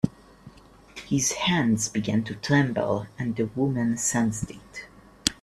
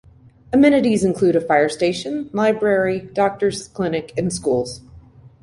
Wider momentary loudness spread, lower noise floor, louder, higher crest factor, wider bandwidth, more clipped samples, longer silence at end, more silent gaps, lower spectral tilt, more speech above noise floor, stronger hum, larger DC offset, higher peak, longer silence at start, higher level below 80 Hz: first, 16 LU vs 10 LU; first, -50 dBFS vs -44 dBFS; second, -25 LUFS vs -19 LUFS; first, 26 dB vs 16 dB; first, 14.5 kHz vs 11.5 kHz; neither; about the same, 0.1 s vs 0.15 s; neither; second, -4 dB/octave vs -5.5 dB/octave; about the same, 24 dB vs 26 dB; neither; neither; about the same, 0 dBFS vs -2 dBFS; second, 0.05 s vs 0.5 s; about the same, -52 dBFS vs -50 dBFS